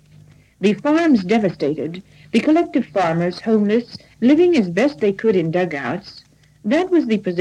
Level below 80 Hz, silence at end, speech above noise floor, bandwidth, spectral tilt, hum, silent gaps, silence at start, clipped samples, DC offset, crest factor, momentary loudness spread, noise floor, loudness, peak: -58 dBFS; 0 s; 30 dB; 10 kHz; -7 dB/octave; none; none; 0.6 s; under 0.1%; under 0.1%; 14 dB; 10 LU; -48 dBFS; -18 LUFS; -4 dBFS